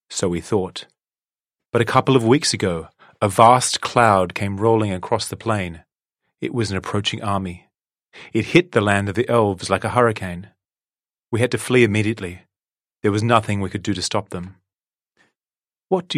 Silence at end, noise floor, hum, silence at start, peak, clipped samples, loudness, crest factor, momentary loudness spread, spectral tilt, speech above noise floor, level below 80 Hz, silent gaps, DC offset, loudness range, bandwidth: 0 s; under -90 dBFS; none; 0.1 s; 0 dBFS; under 0.1%; -19 LUFS; 20 dB; 14 LU; -5 dB/octave; over 71 dB; -54 dBFS; none; under 0.1%; 7 LU; 15 kHz